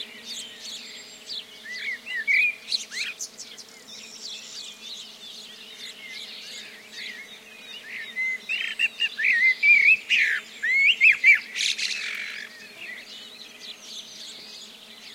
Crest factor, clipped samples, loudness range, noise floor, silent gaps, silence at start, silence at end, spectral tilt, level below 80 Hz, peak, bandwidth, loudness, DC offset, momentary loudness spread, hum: 20 dB; under 0.1%; 19 LU; -45 dBFS; none; 0 s; 0 s; 2 dB/octave; -80 dBFS; -6 dBFS; 16 kHz; -20 LUFS; under 0.1%; 24 LU; none